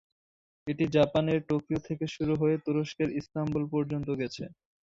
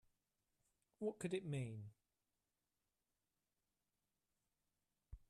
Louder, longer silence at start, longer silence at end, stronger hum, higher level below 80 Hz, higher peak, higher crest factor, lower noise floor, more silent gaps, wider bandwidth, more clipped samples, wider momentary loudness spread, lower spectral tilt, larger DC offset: first, -30 LUFS vs -47 LUFS; second, 0.65 s vs 1 s; first, 0.35 s vs 0.1 s; neither; first, -58 dBFS vs -74 dBFS; first, -10 dBFS vs -32 dBFS; about the same, 20 dB vs 22 dB; about the same, under -90 dBFS vs under -90 dBFS; neither; second, 7.6 kHz vs 12.5 kHz; neither; second, 11 LU vs 16 LU; about the same, -7.5 dB/octave vs -6.5 dB/octave; neither